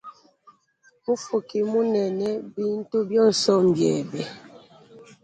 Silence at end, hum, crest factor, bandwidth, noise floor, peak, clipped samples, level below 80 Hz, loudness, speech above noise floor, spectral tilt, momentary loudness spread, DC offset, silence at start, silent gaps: 0.2 s; none; 18 dB; 9.4 kHz; -62 dBFS; -6 dBFS; under 0.1%; -68 dBFS; -23 LUFS; 39 dB; -5.5 dB/octave; 13 LU; under 0.1%; 0.05 s; none